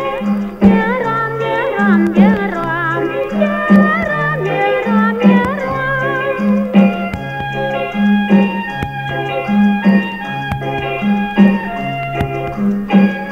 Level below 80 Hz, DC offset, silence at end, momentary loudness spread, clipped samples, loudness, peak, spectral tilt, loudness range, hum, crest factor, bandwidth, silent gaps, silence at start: -40 dBFS; under 0.1%; 0 s; 9 LU; under 0.1%; -14 LUFS; 0 dBFS; -8 dB/octave; 2 LU; none; 14 dB; 6.2 kHz; none; 0 s